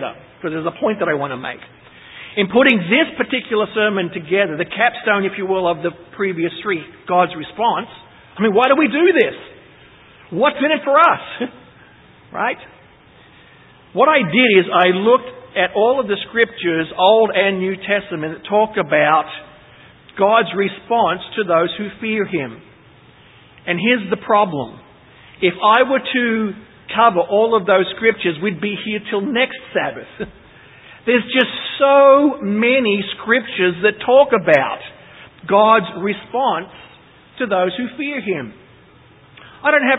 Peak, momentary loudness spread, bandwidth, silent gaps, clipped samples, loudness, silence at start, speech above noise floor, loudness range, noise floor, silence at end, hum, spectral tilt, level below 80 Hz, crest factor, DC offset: 0 dBFS; 14 LU; 4 kHz; none; under 0.1%; -16 LUFS; 0 s; 31 dB; 6 LU; -47 dBFS; 0 s; none; -8 dB/octave; -58 dBFS; 18 dB; under 0.1%